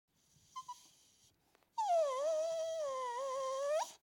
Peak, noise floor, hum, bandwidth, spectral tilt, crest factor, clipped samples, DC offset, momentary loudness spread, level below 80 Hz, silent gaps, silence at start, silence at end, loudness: -26 dBFS; -74 dBFS; none; 17 kHz; 0 dB/octave; 14 dB; under 0.1%; under 0.1%; 18 LU; -88 dBFS; none; 0.55 s; 0.05 s; -38 LUFS